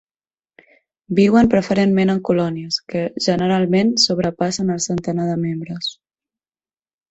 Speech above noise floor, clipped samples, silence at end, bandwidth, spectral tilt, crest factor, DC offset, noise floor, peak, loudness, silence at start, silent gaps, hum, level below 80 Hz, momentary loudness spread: over 73 dB; under 0.1%; 1.2 s; 8.2 kHz; -5 dB/octave; 16 dB; under 0.1%; under -90 dBFS; -2 dBFS; -18 LUFS; 1.1 s; none; none; -50 dBFS; 10 LU